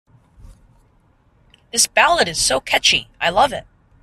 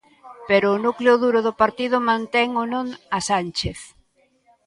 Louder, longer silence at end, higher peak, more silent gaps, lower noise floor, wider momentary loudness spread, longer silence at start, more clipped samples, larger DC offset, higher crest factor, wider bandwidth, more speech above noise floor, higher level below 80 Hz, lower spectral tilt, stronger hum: first, -16 LUFS vs -20 LUFS; second, 0.4 s vs 0.8 s; about the same, -2 dBFS vs -2 dBFS; neither; second, -56 dBFS vs -61 dBFS; second, 6 LU vs 10 LU; first, 0.45 s vs 0.25 s; neither; neither; about the same, 20 dB vs 18 dB; first, 15.5 kHz vs 11.5 kHz; about the same, 39 dB vs 41 dB; about the same, -46 dBFS vs -50 dBFS; second, -0.5 dB/octave vs -4.5 dB/octave; neither